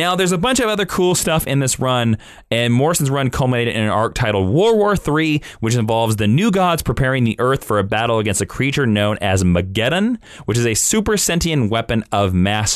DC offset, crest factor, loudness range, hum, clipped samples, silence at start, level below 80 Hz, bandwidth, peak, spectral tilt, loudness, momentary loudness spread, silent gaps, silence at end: under 0.1%; 10 dB; 1 LU; none; under 0.1%; 0 s; -38 dBFS; 14 kHz; -6 dBFS; -4.5 dB/octave; -17 LUFS; 4 LU; none; 0 s